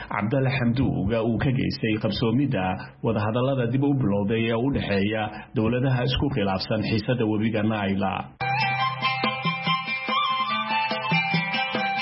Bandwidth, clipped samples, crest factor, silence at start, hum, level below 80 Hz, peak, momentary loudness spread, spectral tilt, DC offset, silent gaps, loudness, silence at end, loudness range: 5.8 kHz; under 0.1%; 14 dB; 0 s; none; -46 dBFS; -10 dBFS; 3 LU; -10.5 dB/octave; under 0.1%; none; -24 LUFS; 0 s; 1 LU